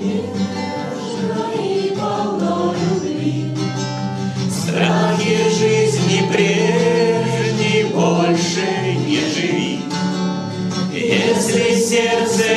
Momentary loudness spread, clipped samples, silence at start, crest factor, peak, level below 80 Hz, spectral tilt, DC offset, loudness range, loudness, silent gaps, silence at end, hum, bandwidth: 7 LU; under 0.1%; 0 s; 14 dB; -4 dBFS; -60 dBFS; -5 dB/octave; under 0.1%; 5 LU; -18 LUFS; none; 0 s; none; 13.5 kHz